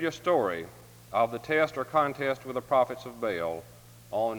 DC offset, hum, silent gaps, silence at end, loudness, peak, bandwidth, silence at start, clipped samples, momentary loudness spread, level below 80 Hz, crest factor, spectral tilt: under 0.1%; none; none; 0 s; -29 LUFS; -12 dBFS; over 20 kHz; 0 s; under 0.1%; 9 LU; -64 dBFS; 18 dB; -5.5 dB/octave